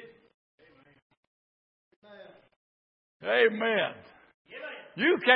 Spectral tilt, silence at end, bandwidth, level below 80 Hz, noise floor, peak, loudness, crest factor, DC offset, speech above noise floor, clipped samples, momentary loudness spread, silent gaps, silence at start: -7.5 dB/octave; 0 s; 5.2 kHz; -82 dBFS; -52 dBFS; -6 dBFS; -27 LUFS; 26 dB; under 0.1%; 27 dB; under 0.1%; 24 LU; 0.34-0.58 s, 1.02-1.10 s, 1.17-2.02 s, 2.56-3.20 s, 4.34-4.45 s; 0 s